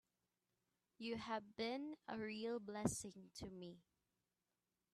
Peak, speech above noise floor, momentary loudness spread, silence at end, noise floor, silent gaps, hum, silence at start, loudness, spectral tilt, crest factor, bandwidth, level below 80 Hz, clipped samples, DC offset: -22 dBFS; over 42 dB; 11 LU; 1.15 s; under -90 dBFS; none; none; 1 s; -48 LUFS; -4.5 dB/octave; 28 dB; 13 kHz; -76 dBFS; under 0.1%; under 0.1%